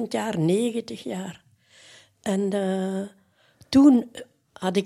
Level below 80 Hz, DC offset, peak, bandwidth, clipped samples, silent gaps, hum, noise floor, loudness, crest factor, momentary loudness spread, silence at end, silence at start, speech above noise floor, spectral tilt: -62 dBFS; under 0.1%; -6 dBFS; 12.5 kHz; under 0.1%; none; none; -58 dBFS; -24 LUFS; 18 dB; 20 LU; 0 s; 0 s; 35 dB; -6.5 dB/octave